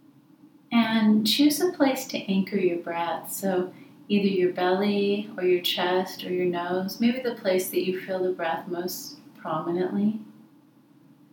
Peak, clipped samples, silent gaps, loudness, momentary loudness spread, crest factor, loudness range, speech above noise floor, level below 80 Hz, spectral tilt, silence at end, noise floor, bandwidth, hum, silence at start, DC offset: -8 dBFS; under 0.1%; none; -25 LUFS; 10 LU; 18 dB; 4 LU; 31 dB; -86 dBFS; -5 dB/octave; 1 s; -56 dBFS; 20 kHz; none; 0.45 s; under 0.1%